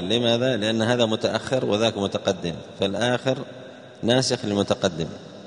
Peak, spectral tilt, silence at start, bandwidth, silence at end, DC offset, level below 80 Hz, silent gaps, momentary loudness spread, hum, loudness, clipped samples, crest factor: -4 dBFS; -4.5 dB/octave; 0 s; 10.5 kHz; 0 s; under 0.1%; -58 dBFS; none; 11 LU; none; -23 LUFS; under 0.1%; 20 dB